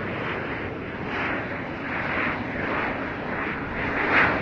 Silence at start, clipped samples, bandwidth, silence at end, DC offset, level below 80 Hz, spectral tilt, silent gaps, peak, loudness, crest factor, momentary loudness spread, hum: 0 s; under 0.1%; 7.4 kHz; 0 s; under 0.1%; -46 dBFS; -7 dB/octave; none; -8 dBFS; -26 LUFS; 20 dB; 10 LU; none